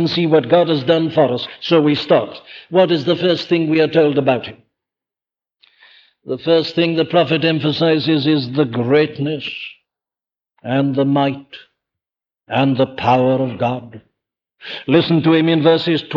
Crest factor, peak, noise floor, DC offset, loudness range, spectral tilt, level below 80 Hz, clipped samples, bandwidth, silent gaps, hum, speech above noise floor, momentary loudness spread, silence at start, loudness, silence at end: 16 dB; 0 dBFS; under -90 dBFS; under 0.1%; 4 LU; -8 dB/octave; -60 dBFS; under 0.1%; 6.8 kHz; none; none; over 74 dB; 12 LU; 0 s; -16 LUFS; 0 s